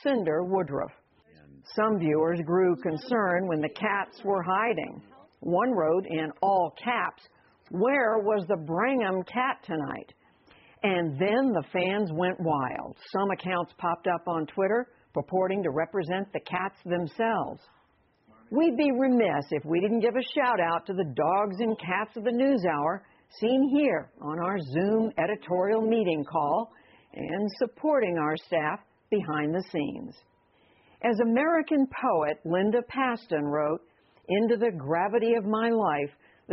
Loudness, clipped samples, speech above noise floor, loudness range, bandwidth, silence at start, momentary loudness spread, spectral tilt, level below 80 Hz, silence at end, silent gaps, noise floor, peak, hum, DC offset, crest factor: -28 LUFS; under 0.1%; 39 dB; 3 LU; 5.8 kHz; 0.05 s; 8 LU; -5 dB/octave; -68 dBFS; 0 s; none; -66 dBFS; -12 dBFS; none; under 0.1%; 16 dB